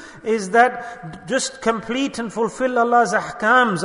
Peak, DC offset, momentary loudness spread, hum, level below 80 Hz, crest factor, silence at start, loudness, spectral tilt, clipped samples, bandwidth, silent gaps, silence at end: -2 dBFS; under 0.1%; 9 LU; none; -56 dBFS; 18 dB; 0 s; -19 LUFS; -3.5 dB/octave; under 0.1%; 11 kHz; none; 0 s